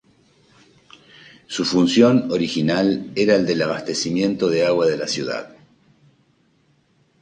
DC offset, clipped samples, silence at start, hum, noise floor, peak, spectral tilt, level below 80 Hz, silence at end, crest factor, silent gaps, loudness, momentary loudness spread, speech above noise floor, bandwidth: under 0.1%; under 0.1%; 1.5 s; none; -61 dBFS; -2 dBFS; -5 dB/octave; -60 dBFS; 1.75 s; 20 dB; none; -19 LUFS; 9 LU; 42 dB; 9.8 kHz